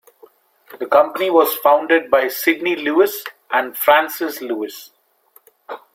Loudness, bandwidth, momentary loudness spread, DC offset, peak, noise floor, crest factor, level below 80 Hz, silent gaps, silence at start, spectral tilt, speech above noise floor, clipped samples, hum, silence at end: -17 LUFS; 16.5 kHz; 15 LU; under 0.1%; 0 dBFS; -55 dBFS; 18 dB; -64 dBFS; none; 0.7 s; -2.5 dB/octave; 38 dB; under 0.1%; none; 0.15 s